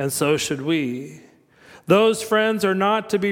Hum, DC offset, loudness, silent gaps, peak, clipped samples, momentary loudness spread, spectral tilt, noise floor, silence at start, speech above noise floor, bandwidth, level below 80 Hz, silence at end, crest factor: none; under 0.1%; -20 LUFS; none; -4 dBFS; under 0.1%; 14 LU; -4.5 dB/octave; -50 dBFS; 0 s; 30 dB; 17 kHz; -62 dBFS; 0 s; 16 dB